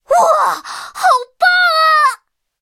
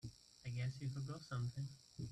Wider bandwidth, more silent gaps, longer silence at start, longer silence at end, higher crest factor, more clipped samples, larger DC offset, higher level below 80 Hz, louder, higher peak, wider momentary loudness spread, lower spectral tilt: first, 16.5 kHz vs 11.5 kHz; neither; about the same, 0.1 s vs 0.05 s; first, 0.45 s vs 0 s; about the same, 14 dB vs 12 dB; neither; neither; first, -62 dBFS vs -70 dBFS; first, -12 LUFS vs -47 LUFS; first, 0 dBFS vs -34 dBFS; first, 13 LU vs 9 LU; second, 1 dB/octave vs -6 dB/octave